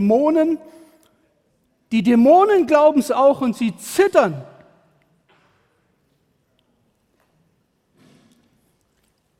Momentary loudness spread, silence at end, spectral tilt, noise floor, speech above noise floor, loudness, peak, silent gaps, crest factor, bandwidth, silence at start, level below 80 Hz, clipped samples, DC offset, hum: 11 LU; 4.95 s; -6 dB/octave; -65 dBFS; 50 dB; -16 LUFS; -2 dBFS; none; 18 dB; 16 kHz; 0 s; -62 dBFS; under 0.1%; under 0.1%; none